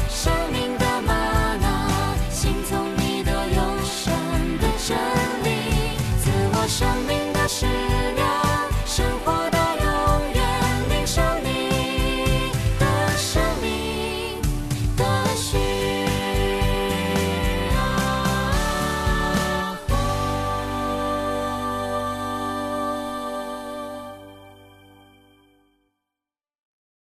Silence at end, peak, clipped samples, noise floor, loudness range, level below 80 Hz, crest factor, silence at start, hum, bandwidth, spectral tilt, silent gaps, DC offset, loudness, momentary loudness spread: 2.55 s; -8 dBFS; under 0.1%; -89 dBFS; 6 LU; -30 dBFS; 14 dB; 0 s; none; 14 kHz; -4.5 dB/octave; none; under 0.1%; -23 LUFS; 5 LU